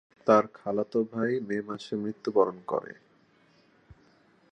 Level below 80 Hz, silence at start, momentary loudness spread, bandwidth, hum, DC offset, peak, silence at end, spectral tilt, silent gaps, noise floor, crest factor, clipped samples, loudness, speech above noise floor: -72 dBFS; 0.25 s; 11 LU; 9.2 kHz; none; under 0.1%; -8 dBFS; 1.6 s; -7 dB/octave; none; -63 dBFS; 22 dB; under 0.1%; -28 LUFS; 35 dB